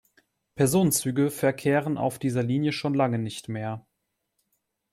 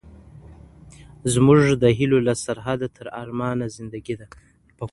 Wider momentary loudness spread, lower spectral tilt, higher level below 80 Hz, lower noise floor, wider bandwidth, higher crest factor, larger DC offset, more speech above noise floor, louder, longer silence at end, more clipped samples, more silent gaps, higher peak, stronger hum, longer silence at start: second, 11 LU vs 18 LU; about the same, -5.5 dB/octave vs -6 dB/octave; second, -62 dBFS vs -48 dBFS; first, -79 dBFS vs -45 dBFS; first, 16 kHz vs 11.5 kHz; about the same, 18 dB vs 20 dB; neither; first, 55 dB vs 25 dB; second, -26 LUFS vs -21 LUFS; first, 1.15 s vs 0.05 s; neither; neither; second, -10 dBFS vs -2 dBFS; neither; first, 0.55 s vs 0.05 s